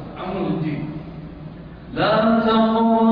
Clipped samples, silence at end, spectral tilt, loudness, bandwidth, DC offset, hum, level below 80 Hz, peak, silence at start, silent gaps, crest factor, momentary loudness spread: under 0.1%; 0 s; -9.5 dB/octave; -19 LUFS; 5.2 kHz; under 0.1%; none; -46 dBFS; -6 dBFS; 0 s; none; 14 dB; 20 LU